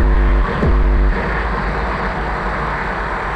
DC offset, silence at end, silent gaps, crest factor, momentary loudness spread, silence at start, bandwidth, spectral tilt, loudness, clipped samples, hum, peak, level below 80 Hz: under 0.1%; 0 s; none; 10 dB; 5 LU; 0 s; 6 kHz; -7.5 dB/octave; -18 LUFS; under 0.1%; none; -6 dBFS; -18 dBFS